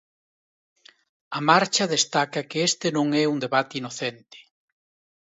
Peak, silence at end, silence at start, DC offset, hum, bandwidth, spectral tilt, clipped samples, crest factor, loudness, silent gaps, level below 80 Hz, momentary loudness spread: -2 dBFS; 0.8 s; 1.3 s; under 0.1%; none; 8.2 kHz; -3 dB/octave; under 0.1%; 22 dB; -23 LUFS; none; -74 dBFS; 12 LU